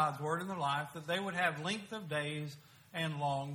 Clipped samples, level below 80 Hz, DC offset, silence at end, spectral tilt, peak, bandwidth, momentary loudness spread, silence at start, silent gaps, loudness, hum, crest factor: under 0.1%; -76 dBFS; under 0.1%; 0 s; -5 dB/octave; -18 dBFS; 19 kHz; 9 LU; 0 s; none; -37 LUFS; none; 18 dB